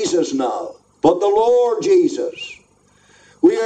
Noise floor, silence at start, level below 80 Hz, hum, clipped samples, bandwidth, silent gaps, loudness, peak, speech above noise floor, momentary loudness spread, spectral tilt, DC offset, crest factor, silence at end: -55 dBFS; 0 s; -58 dBFS; 50 Hz at -55 dBFS; under 0.1%; 9.2 kHz; none; -17 LUFS; -2 dBFS; 38 dB; 15 LU; -4.5 dB/octave; under 0.1%; 16 dB; 0 s